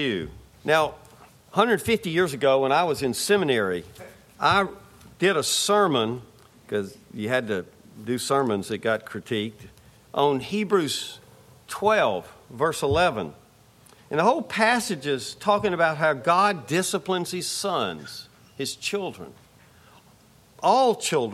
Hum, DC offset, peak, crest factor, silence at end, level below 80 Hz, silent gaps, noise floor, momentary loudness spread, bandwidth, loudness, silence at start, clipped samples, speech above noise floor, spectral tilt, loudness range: none; under 0.1%; -4 dBFS; 20 dB; 0 s; -56 dBFS; none; -55 dBFS; 14 LU; 16 kHz; -24 LUFS; 0 s; under 0.1%; 31 dB; -4 dB/octave; 5 LU